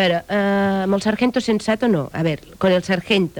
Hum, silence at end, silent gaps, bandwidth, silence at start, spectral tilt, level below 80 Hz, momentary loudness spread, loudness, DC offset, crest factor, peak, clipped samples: none; 0 s; none; 19.5 kHz; 0 s; -6 dB/octave; -50 dBFS; 3 LU; -19 LUFS; under 0.1%; 14 dB; -6 dBFS; under 0.1%